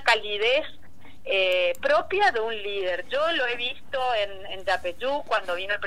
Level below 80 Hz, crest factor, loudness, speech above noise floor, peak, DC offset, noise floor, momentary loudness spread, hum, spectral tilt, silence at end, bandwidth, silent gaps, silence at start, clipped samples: -58 dBFS; 20 dB; -25 LUFS; 24 dB; -6 dBFS; 2%; -50 dBFS; 7 LU; none; -2.5 dB/octave; 0 s; 15.5 kHz; none; 0 s; under 0.1%